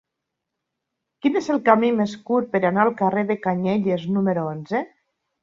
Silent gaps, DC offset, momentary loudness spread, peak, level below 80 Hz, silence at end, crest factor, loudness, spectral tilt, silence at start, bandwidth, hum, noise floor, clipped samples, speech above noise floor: none; under 0.1%; 8 LU; -2 dBFS; -66 dBFS; 0.55 s; 20 dB; -21 LUFS; -7.5 dB/octave; 1.25 s; 7.6 kHz; none; -82 dBFS; under 0.1%; 61 dB